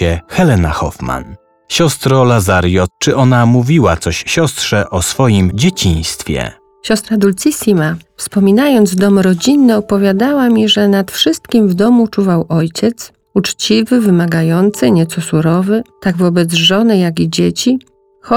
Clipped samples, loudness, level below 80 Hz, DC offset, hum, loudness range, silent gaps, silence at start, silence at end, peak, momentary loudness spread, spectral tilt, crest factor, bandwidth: under 0.1%; -12 LUFS; -34 dBFS; under 0.1%; none; 3 LU; none; 0 s; 0 s; 0 dBFS; 8 LU; -5.5 dB/octave; 12 dB; 17.5 kHz